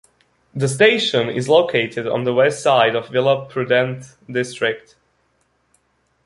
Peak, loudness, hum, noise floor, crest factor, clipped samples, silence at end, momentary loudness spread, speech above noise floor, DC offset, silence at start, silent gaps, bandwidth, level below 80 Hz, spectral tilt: -2 dBFS; -18 LUFS; none; -64 dBFS; 18 dB; under 0.1%; 1.5 s; 10 LU; 47 dB; under 0.1%; 0.55 s; none; 11.5 kHz; -62 dBFS; -4.5 dB/octave